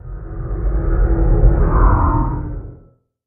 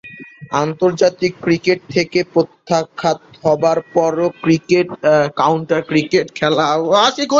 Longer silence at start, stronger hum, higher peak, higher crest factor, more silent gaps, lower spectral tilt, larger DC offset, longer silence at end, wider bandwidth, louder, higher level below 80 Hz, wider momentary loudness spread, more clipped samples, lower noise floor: about the same, 0.05 s vs 0.05 s; neither; about the same, 0 dBFS vs 0 dBFS; about the same, 16 dB vs 16 dB; neither; first, -12.5 dB/octave vs -5 dB/octave; neither; first, 0.5 s vs 0 s; second, 2.3 kHz vs 7.6 kHz; about the same, -17 LUFS vs -16 LUFS; first, -16 dBFS vs -56 dBFS; first, 15 LU vs 6 LU; neither; first, -49 dBFS vs -36 dBFS